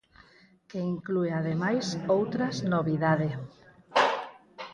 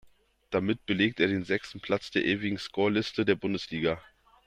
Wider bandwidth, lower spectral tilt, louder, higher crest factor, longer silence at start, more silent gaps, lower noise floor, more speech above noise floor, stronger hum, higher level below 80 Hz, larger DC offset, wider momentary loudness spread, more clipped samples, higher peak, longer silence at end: about the same, 10 kHz vs 10.5 kHz; about the same, -6 dB/octave vs -6 dB/octave; about the same, -28 LUFS vs -29 LUFS; about the same, 20 dB vs 20 dB; first, 0.7 s vs 0.5 s; neither; about the same, -58 dBFS vs -57 dBFS; about the same, 30 dB vs 28 dB; neither; about the same, -64 dBFS vs -62 dBFS; neither; first, 15 LU vs 6 LU; neither; about the same, -10 dBFS vs -10 dBFS; second, 0 s vs 0.45 s